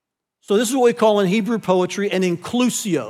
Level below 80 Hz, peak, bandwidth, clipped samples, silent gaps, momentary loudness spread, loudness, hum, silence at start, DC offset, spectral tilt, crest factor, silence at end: -68 dBFS; -4 dBFS; 16 kHz; under 0.1%; none; 5 LU; -18 LUFS; none; 0.5 s; under 0.1%; -5 dB/octave; 14 dB; 0 s